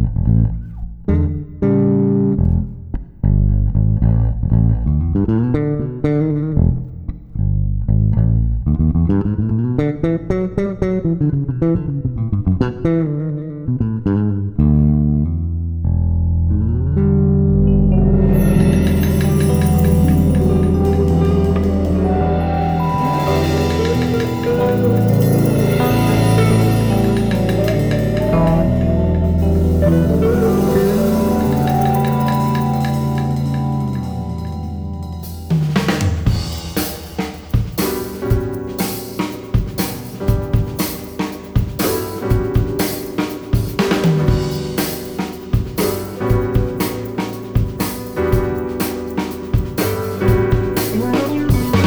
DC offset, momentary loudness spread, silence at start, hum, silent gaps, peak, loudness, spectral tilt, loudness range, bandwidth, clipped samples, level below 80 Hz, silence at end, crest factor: under 0.1%; 9 LU; 0 s; none; none; -2 dBFS; -17 LUFS; -7.5 dB/octave; 6 LU; over 20 kHz; under 0.1%; -24 dBFS; 0 s; 14 dB